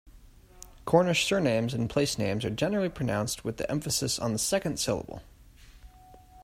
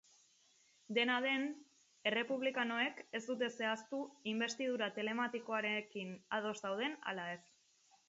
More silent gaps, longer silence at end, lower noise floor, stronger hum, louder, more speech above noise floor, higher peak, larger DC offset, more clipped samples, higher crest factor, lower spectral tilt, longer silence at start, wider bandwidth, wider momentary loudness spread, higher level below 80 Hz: neither; second, 0 s vs 0.7 s; second, -53 dBFS vs -72 dBFS; neither; first, -28 LUFS vs -39 LUFS; second, 25 dB vs 32 dB; first, -8 dBFS vs -20 dBFS; neither; neither; about the same, 22 dB vs 20 dB; first, -4.5 dB/octave vs -1.5 dB/octave; second, 0.05 s vs 0.9 s; first, 16 kHz vs 7.6 kHz; about the same, 8 LU vs 9 LU; first, -52 dBFS vs -90 dBFS